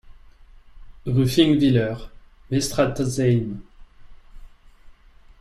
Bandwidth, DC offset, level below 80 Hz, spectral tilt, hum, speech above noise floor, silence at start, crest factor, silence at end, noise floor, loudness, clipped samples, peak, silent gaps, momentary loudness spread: 14.5 kHz; under 0.1%; -44 dBFS; -6 dB/octave; none; 29 dB; 0.05 s; 20 dB; 0.5 s; -49 dBFS; -21 LUFS; under 0.1%; -4 dBFS; none; 17 LU